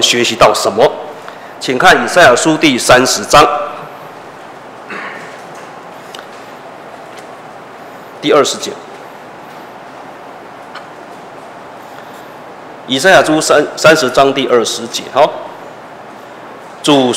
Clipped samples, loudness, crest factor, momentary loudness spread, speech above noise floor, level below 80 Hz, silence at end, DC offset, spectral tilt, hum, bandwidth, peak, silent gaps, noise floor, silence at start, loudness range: 0.2%; -10 LUFS; 14 dB; 24 LU; 22 dB; -44 dBFS; 0 s; under 0.1%; -3 dB/octave; none; 16.5 kHz; 0 dBFS; none; -31 dBFS; 0 s; 20 LU